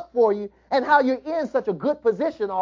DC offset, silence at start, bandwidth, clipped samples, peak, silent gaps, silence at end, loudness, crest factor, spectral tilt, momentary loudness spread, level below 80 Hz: under 0.1%; 0 s; 7.4 kHz; under 0.1%; -4 dBFS; none; 0 s; -22 LUFS; 18 dB; -6.5 dB/octave; 7 LU; -62 dBFS